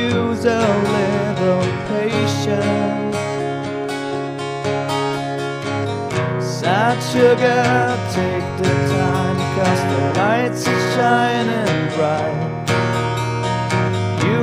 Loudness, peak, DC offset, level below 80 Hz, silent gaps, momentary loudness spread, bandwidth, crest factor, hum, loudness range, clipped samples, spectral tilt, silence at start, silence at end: -18 LUFS; -2 dBFS; under 0.1%; -50 dBFS; none; 7 LU; 15.5 kHz; 16 dB; none; 5 LU; under 0.1%; -6 dB/octave; 0 s; 0 s